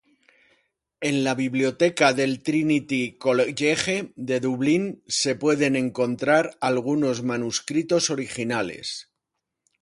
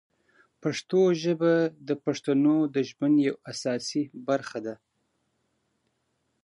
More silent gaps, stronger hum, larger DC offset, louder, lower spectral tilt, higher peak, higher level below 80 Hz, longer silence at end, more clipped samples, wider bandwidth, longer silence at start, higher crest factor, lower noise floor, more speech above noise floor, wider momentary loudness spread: neither; neither; neither; first, -23 LUFS vs -26 LUFS; second, -4 dB/octave vs -6 dB/octave; first, -4 dBFS vs -12 dBFS; first, -64 dBFS vs -78 dBFS; second, 0.8 s vs 1.7 s; neither; about the same, 11.5 kHz vs 11 kHz; first, 1 s vs 0.65 s; about the same, 20 dB vs 16 dB; first, -82 dBFS vs -75 dBFS; first, 59 dB vs 50 dB; about the same, 7 LU vs 9 LU